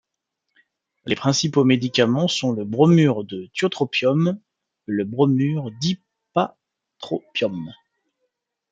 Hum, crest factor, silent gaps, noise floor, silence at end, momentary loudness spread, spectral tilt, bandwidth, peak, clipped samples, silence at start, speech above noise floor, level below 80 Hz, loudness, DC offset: none; 20 dB; none; -80 dBFS; 1 s; 13 LU; -5.5 dB/octave; 7.8 kHz; -2 dBFS; under 0.1%; 1.05 s; 60 dB; -64 dBFS; -21 LUFS; under 0.1%